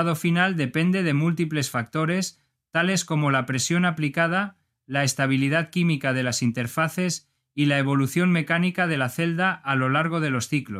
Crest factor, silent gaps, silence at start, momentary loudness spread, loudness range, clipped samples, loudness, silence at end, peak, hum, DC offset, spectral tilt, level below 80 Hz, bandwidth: 18 dB; none; 0 s; 5 LU; 1 LU; under 0.1%; -23 LUFS; 0 s; -6 dBFS; none; under 0.1%; -5 dB/octave; -66 dBFS; 15.5 kHz